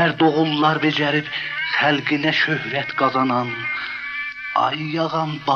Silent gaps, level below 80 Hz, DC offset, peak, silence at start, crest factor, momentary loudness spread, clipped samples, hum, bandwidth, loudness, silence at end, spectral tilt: none; -62 dBFS; under 0.1%; -4 dBFS; 0 s; 16 dB; 7 LU; under 0.1%; none; 6.8 kHz; -20 LUFS; 0 s; -6 dB/octave